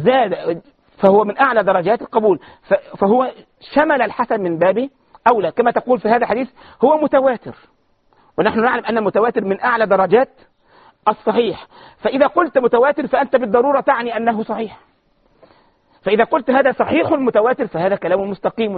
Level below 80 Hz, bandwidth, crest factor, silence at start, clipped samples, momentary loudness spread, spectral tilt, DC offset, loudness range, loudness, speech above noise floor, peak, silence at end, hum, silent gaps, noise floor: -56 dBFS; 4.8 kHz; 16 dB; 0 s; under 0.1%; 9 LU; -4 dB/octave; under 0.1%; 2 LU; -16 LUFS; 42 dB; 0 dBFS; 0 s; none; none; -58 dBFS